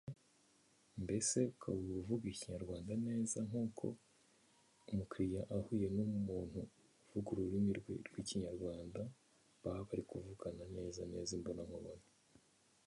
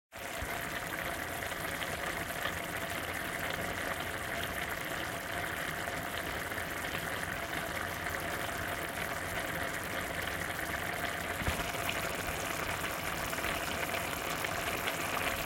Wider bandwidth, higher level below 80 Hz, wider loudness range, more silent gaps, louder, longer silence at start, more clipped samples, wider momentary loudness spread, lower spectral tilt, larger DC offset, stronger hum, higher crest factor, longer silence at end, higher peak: second, 11.5 kHz vs 17 kHz; second, -64 dBFS vs -52 dBFS; first, 6 LU vs 2 LU; neither; second, -43 LUFS vs -35 LUFS; about the same, 0.05 s vs 0.1 s; neither; first, 11 LU vs 3 LU; first, -5.5 dB/octave vs -3 dB/octave; neither; neither; about the same, 20 dB vs 22 dB; first, 0.85 s vs 0 s; second, -24 dBFS vs -14 dBFS